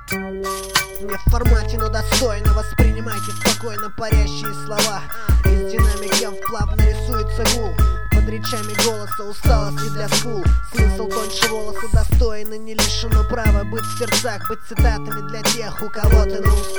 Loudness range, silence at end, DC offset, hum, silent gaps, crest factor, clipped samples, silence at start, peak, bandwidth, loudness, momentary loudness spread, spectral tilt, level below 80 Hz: 1 LU; 0 s; 5%; none; none; 18 dB; under 0.1%; 0 s; 0 dBFS; over 20 kHz; -20 LUFS; 8 LU; -4 dB/octave; -20 dBFS